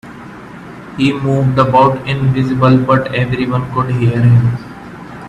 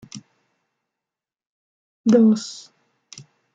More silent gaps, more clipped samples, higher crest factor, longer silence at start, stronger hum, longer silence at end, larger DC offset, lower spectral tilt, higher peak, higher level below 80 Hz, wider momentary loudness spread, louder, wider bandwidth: second, none vs 1.47-2.04 s; neither; second, 14 dB vs 20 dB; about the same, 0.05 s vs 0.15 s; neither; second, 0 s vs 1 s; neither; first, -8.5 dB/octave vs -6.5 dB/octave; first, 0 dBFS vs -4 dBFS; first, -40 dBFS vs -72 dBFS; second, 21 LU vs 25 LU; first, -13 LUFS vs -18 LUFS; about the same, 8.4 kHz vs 7.8 kHz